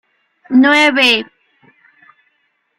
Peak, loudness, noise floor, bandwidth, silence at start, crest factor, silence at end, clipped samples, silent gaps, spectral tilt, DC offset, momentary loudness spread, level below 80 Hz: 0 dBFS; -11 LUFS; -64 dBFS; 14.5 kHz; 0.5 s; 16 dB; 1.55 s; under 0.1%; none; -2.5 dB/octave; under 0.1%; 8 LU; -64 dBFS